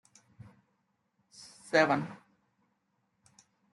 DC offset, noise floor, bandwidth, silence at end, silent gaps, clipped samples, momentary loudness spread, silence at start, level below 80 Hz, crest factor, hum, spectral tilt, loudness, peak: under 0.1%; -78 dBFS; 11.5 kHz; 1.6 s; none; under 0.1%; 26 LU; 1.4 s; -78 dBFS; 24 dB; none; -5 dB/octave; -28 LUFS; -12 dBFS